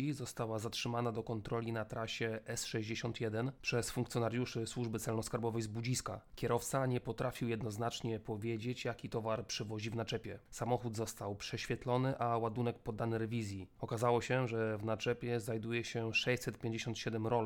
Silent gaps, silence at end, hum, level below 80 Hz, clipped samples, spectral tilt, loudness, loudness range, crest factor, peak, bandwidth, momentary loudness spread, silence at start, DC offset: none; 0 s; none; -62 dBFS; under 0.1%; -5 dB/octave; -39 LUFS; 3 LU; 18 dB; -20 dBFS; 18.5 kHz; 6 LU; 0 s; under 0.1%